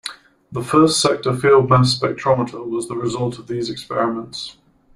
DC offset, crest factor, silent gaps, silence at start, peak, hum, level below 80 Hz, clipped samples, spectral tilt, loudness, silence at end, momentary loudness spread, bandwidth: under 0.1%; 16 dB; none; 0.05 s; -2 dBFS; none; -52 dBFS; under 0.1%; -5 dB/octave; -18 LUFS; 0.45 s; 16 LU; 13 kHz